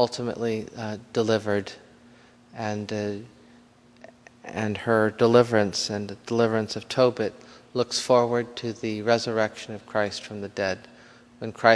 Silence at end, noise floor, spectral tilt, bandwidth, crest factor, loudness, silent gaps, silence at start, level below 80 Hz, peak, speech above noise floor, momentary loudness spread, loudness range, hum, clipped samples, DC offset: 0 s; -54 dBFS; -5 dB/octave; 11 kHz; 24 dB; -26 LUFS; none; 0 s; -66 dBFS; -2 dBFS; 30 dB; 14 LU; 7 LU; none; under 0.1%; under 0.1%